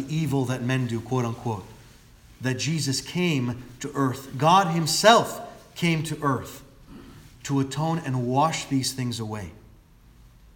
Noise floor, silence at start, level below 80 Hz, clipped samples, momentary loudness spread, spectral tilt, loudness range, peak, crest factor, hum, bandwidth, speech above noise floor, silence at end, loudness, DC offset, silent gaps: -52 dBFS; 0 s; -54 dBFS; under 0.1%; 16 LU; -5 dB/octave; 6 LU; -2 dBFS; 24 dB; none; 18 kHz; 28 dB; 0.95 s; -25 LUFS; under 0.1%; none